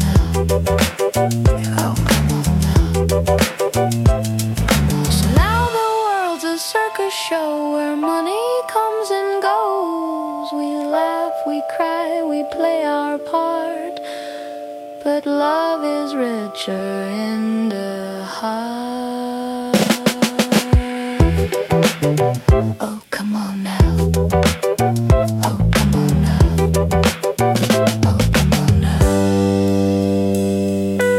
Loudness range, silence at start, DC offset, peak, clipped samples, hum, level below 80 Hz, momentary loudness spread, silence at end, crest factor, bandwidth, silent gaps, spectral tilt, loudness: 6 LU; 0 s; under 0.1%; -2 dBFS; under 0.1%; none; -28 dBFS; 9 LU; 0 s; 16 dB; 16.5 kHz; none; -5.5 dB/octave; -18 LUFS